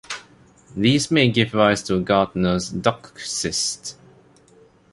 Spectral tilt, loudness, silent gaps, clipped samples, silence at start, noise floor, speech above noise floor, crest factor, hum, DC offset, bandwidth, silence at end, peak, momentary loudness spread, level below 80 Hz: -4.5 dB/octave; -20 LUFS; none; under 0.1%; 0.1 s; -53 dBFS; 33 dB; 22 dB; none; under 0.1%; 11.5 kHz; 1 s; 0 dBFS; 16 LU; -48 dBFS